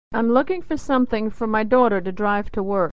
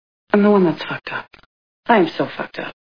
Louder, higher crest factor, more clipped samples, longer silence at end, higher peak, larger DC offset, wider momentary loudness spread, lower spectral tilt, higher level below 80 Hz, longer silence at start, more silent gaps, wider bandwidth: second, -21 LUFS vs -18 LUFS; about the same, 16 dB vs 20 dB; neither; about the same, 0 s vs 0.1 s; second, -4 dBFS vs 0 dBFS; first, 3% vs under 0.1%; second, 7 LU vs 14 LU; second, -7 dB/octave vs -8.5 dB/octave; first, -44 dBFS vs -62 dBFS; second, 0.1 s vs 0.35 s; second, none vs 1.46-1.83 s; first, 8 kHz vs 5.4 kHz